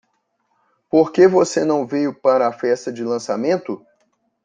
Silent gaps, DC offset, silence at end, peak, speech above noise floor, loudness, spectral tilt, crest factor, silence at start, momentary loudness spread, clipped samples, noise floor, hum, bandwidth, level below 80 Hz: none; under 0.1%; 0.7 s; -2 dBFS; 51 dB; -18 LUFS; -5.5 dB/octave; 16 dB; 0.95 s; 10 LU; under 0.1%; -68 dBFS; none; 9.4 kHz; -64 dBFS